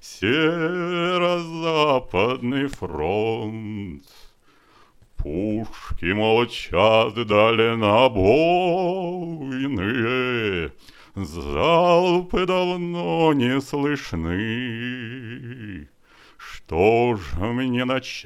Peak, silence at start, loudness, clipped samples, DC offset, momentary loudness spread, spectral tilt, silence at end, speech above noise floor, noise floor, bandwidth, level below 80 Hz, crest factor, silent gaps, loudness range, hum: -2 dBFS; 0.05 s; -21 LUFS; under 0.1%; under 0.1%; 16 LU; -6 dB/octave; 0 s; 34 dB; -55 dBFS; 13 kHz; -42 dBFS; 20 dB; none; 8 LU; none